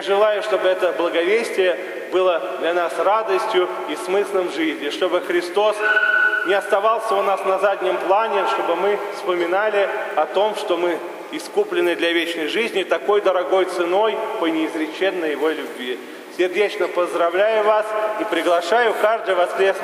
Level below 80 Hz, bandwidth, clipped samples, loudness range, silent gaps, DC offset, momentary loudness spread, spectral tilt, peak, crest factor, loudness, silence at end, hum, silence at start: -84 dBFS; 16 kHz; under 0.1%; 3 LU; none; under 0.1%; 6 LU; -3 dB/octave; -4 dBFS; 16 dB; -19 LUFS; 0 s; none; 0 s